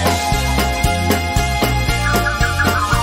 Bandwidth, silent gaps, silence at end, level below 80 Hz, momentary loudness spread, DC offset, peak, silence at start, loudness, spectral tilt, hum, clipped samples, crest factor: 16.5 kHz; none; 0 s; -22 dBFS; 2 LU; under 0.1%; -4 dBFS; 0 s; -16 LUFS; -4 dB/octave; none; under 0.1%; 12 dB